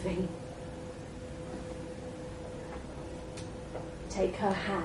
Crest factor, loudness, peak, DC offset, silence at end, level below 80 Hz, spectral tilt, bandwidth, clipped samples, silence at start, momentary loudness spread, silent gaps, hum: 20 dB; -38 LUFS; -18 dBFS; under 0.1%; 0 s; -50 dBFS; -6 dB/octave; 11.5 kHz; under 0.1%; 0 s; 12 LU; none; none